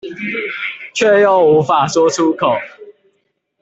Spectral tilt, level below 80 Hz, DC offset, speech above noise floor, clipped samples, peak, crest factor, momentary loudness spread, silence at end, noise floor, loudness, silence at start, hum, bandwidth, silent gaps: -4.5 dB/octave; -58 dBFS; under 0.1%; 53 dB; under 0.1%; -2 dBFS; 12 dB; 12 LU; 0.7 s; -66 dBFS; -14 LUFS; 0.05 s; none; 8 kHz; none